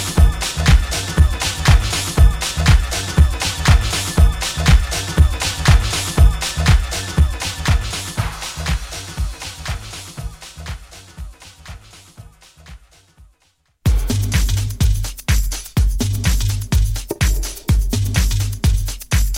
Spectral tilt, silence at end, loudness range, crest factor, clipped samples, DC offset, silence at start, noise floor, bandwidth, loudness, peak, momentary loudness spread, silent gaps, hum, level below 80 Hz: -4 dB/octave; 0 s; 15 LU; 16 dB; under 0.1%; under 0.1%; 0 s; -61 dBFS; 16.5 kHz; -18 LUFS; 0 dBFS; 16 LU; none; none; -18 dBFS